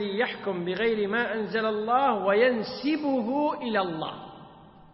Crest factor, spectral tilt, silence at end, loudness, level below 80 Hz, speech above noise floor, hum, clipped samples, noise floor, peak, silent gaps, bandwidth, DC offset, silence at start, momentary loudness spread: 16 dB; -9 dB/octave; 0.25 s; -26 LUFS; -64 dBFS; 24 dB; none; under 0.1%; -50 dBFS; -10 dBFS; none; 5.8 kHz; under 0.1%; 0 s; 8 LU